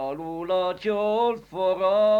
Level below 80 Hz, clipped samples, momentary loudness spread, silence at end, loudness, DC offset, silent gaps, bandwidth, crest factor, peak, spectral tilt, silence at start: -60 dBFS; under 0.1%; 6 LU; 0 s; -25 LUFS; under 0.1%; none; 7.6 kHz; 12 dB; -12 dBFS; -6.5 dB/octave; 0 s